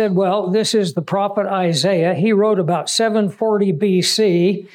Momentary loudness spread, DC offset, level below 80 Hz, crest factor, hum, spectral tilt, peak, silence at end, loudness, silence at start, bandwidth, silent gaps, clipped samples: 4 LU; under 0.1%; -78 dBFS; 10 dB; none; -5 dB/octave; -6 dBFS; 0.1 s; -17 LUFS; 0 s; 16 kHz; none; under 0.1%